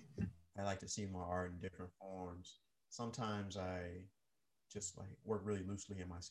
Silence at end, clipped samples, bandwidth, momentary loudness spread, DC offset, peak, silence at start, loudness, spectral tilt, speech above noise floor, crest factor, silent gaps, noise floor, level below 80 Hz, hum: 0 s; under 0.1%; 12 kHz; 11 LU; under 0.1%; -28 dBFS; 0 s; -47 LUFS; -5 dB/octave; 43 dB; 18 dB; none; -89 dBFS; -62 dBFS; none